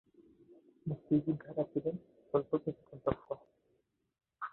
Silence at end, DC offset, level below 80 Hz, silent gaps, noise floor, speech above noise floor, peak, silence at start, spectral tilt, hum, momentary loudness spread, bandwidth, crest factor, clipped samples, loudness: 0.05 s; under 0.1%; -66 dBFS; none; -78 dBFS; 42 dB; -16 dBFS; 0.85 s; -9 dB/octave; none; 13 LU; 4.2 kHz; 22 dB; under 0.1%; -37 LUFS